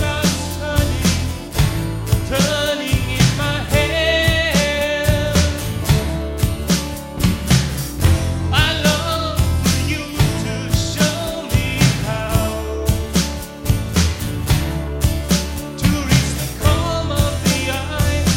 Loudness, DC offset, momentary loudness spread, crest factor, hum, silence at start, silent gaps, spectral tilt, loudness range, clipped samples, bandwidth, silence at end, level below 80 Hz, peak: -18 LUFS; under 0.1%; 6 LU; 18 dB; none; 0 s; none; -4.5 dB/octave; 2 LU; under 0.1%; 16.5 kHz; 0 s; -26 dBFS; 0 dBFS